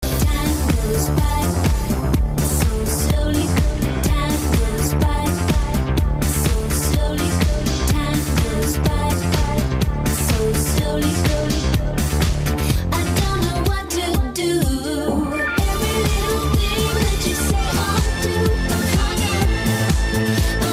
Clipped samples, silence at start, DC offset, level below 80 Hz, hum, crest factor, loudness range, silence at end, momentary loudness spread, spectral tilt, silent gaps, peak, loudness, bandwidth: under 0.1%; 0 s; under 0.1%; -24 dBFS; none; 14 dB; 1 LU; 0 s; 2 LU; -5 dB/octave; none; -4 dBFS; -20 LUFS; 16 kHz